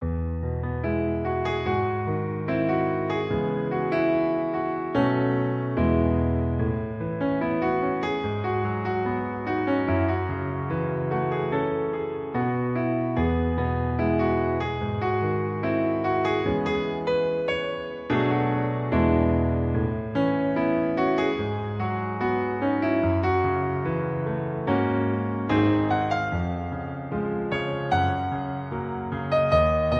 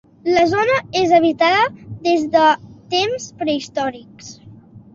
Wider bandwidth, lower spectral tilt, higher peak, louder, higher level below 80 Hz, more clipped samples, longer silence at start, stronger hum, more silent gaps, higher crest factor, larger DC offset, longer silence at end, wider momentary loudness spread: about the same, 7.6 kHz vs 7.6 kHz; first, -9 dB/octave vs -4 dB/octave; second, -8 dBFS vs -2 dBFS; second, -25 LUFS vs -17 LUFS; first, -38 dBFS vs -54 dBFS; neither; second, 0 s vs 0.25 s; neither; neither; about the same, 18 dB vs 16 dB; neither; second, 0 s vs 0.15 s; second, 6 LU vs 11 LU